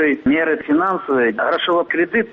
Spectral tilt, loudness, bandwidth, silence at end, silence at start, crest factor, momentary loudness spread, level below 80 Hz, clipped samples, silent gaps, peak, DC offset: -7.5 dB/octave; -17 LUFS; 5.4 kHz; 0 s; 0 s; 10 dB; 1 LU; -54 dBFS; under 0.1%; none; -8 dBFS; under 0.1%